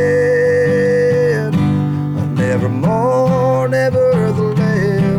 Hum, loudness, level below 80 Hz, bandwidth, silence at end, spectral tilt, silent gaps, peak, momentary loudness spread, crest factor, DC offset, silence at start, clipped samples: none; -14 LUFS; -44 dBFS; 12.5 kHz; 0 s; -8 dB/octave; none; -8 dBFS; 3 LU; 6 dB; under 0.1%; 0 s; under 0.1%